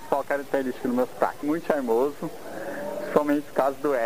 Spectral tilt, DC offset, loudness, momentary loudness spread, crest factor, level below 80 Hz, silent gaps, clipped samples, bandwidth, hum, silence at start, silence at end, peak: -6 dB/octave; 0.9%; -26 LUFS; 10 LU; 20 dB; -64 dBFS; none; under 0.1%; 16 kHz; none; 0 s; 0 s; -6 dBFS